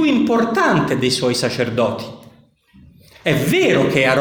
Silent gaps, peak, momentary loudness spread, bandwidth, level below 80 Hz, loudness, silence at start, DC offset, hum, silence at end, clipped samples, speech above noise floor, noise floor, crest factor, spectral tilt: none; 0 dBFS; 7 LU; 20 kHz; -50 dBFS; -17 LUFS; 0 s; under 0.1%; none; 0 s; under 0.1%; 34 dB; -50 dBFS; 16 dB; -5 dB/octave